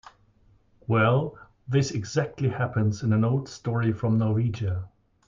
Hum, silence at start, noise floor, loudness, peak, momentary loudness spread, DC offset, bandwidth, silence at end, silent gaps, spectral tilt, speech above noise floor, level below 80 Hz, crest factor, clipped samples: none; 0.9 s; -60 dBFS; -26 LUFS; -10 dBFS; 10 LU; under 0.1%; 7.6 kHz; 0.4 s; none; -7 dB/octave; 36 dB; -56 dBFS; 16 dB; under 0.1%